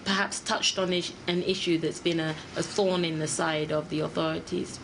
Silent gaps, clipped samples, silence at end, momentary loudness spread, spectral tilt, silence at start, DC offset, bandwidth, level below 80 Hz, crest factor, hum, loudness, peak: none; under 0.1%; 0 s; 5 LU; -4 dB/octave; 0 s; under 0.1%; 10.5 kHz; -60 dBFS; 18 dB; none; -28 LUFS; -12 dBFS